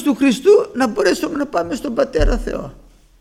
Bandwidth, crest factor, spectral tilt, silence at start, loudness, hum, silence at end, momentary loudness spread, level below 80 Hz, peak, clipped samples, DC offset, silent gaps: 15 kHz; 16 dB; -5.5 dB/octave; 0 s; -17 LUFS; none; 0.45 s; 11 LU; -28 dBFS; -2 dBFS; under 0.1%; under 0.1%; none